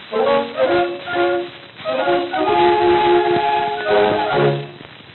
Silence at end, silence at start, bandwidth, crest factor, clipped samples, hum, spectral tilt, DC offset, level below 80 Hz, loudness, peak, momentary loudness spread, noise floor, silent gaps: 0 s; 0 s; 4.3 kHz; 14 dB; under 0.1%; none; -9 dB/octave; under 0.1%; -52 dBFS; -17 LUFS; -2 dBFS; 10 LU; -37 dBFS; none